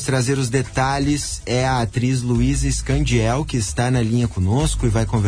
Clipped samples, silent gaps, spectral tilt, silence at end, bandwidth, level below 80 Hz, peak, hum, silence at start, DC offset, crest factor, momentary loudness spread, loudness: under 0.1%; none; -5.5 dB/octave; 0 s; 10.5 kHz; -28 dBFS; -6 dBFS; none; 0 s; under 0.1%; 12 dB; 2 LU; -20 LUFS